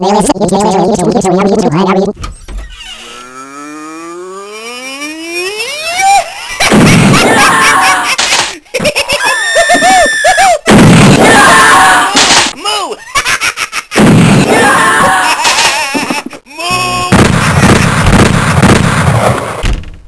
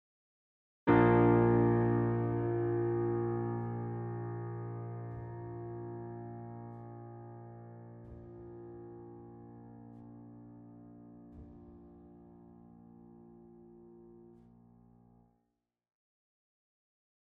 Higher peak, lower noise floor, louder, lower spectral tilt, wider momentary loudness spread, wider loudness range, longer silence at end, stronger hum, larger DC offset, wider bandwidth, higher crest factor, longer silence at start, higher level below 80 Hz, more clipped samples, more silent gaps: first, 0 dBFS vs -14 dBFS; second, -27 dBFS vs -84 dBFS; first, -7 LUFS vs -32 LUFS; second, -4 dB/octave vs -9 dB/octave; second, 21 LU vs 27 LU; second, 11 LU vs 26 LU; second, 0.05 s vs 3.25 s; neither; neither; first, 11 kHz vs 3.8 kHz; second, 8 dB vs 22 dB; second, 0 s vs 0.85 s; first, -26 dBFS vs -60 dBFS; first, 5% vs under 0.1%; neither